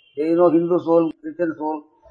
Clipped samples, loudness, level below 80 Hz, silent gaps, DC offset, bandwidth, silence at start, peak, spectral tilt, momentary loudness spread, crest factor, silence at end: under 0.1%; -20 LUFS; -72 dBFS; none; under 0.1%; 4.4 kHz; 0.15 s; -4 dBFS; -10 dB/octave; 11 LU; 16 dB; 0.3 s